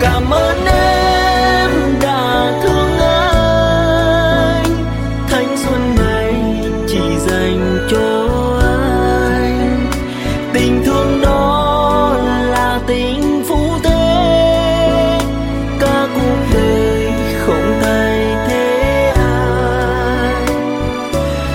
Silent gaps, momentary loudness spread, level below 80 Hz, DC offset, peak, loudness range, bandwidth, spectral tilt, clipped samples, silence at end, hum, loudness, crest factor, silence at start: none; 5 LU; -22 dBFS; under 0.1%; 0 dBFS; 2 LU; 16.5 kHz; -5.5 dB/octave; under 0.1%; 0 s; none; -14 LUFS; 12 dB; 0 s